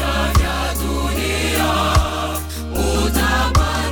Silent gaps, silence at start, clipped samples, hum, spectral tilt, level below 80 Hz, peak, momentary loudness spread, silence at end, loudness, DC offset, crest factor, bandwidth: none; 0 s; under 0.1%; none; -4.5 dB/octave; -22 dBFS; -2 dBFS; 6 LU; 0 s; -18 LUFS; under 0.1%; 16 dB; 19 kHz